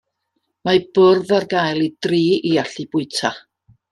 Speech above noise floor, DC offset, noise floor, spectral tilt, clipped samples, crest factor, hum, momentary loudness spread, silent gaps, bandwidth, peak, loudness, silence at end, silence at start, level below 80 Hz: 55 dB; under 0.1%; -73 dBFS; -5.5 dB/octave; under 0.1%; 16 dB; none; 10 LU; none; 11.5 kHz; -2 dBFS; -18 LUFS; 0.55 s; 0.65 s; -62 dBFS